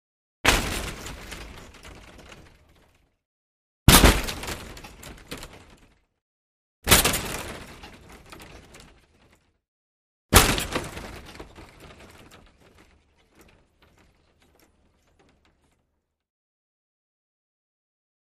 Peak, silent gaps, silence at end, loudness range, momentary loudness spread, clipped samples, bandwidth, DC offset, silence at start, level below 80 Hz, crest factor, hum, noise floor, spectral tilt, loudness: 0 dBFS; 3.25-3.86 s, 6.21-6.82 s, 9.68-10.29 s; 6.7 s; 10 LU; 28 LU; under 0.1%; 15.5 kHz; under 0.1%; 0.45 s; -36 dBFS; 28 dB; none; -76 dBFS; -3 dB/octave; -21 LUFS